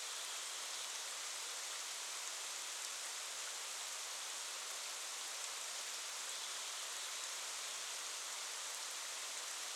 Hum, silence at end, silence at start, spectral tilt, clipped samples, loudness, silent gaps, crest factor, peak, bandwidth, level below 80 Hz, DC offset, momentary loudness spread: none; 0 s; 0 s; 4.5 dB/octave; under 0.1%; -43 LUFS; none; 22 dB; -24 dBFS; 18 kHz; under -90 dBFS; under 0.1%; 1 LU